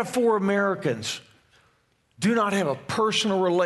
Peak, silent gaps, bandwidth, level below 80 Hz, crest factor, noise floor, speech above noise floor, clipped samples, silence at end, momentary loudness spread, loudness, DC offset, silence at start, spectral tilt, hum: -10 dBFS; none; 12 kHz; -68 dBFS; 14 dB; -66 dBFS; 43 dB; under 0.1%; 0 s; 7 LU; -24 LUFS; under 0.1%; 0 s; -4.5 dB/octave; none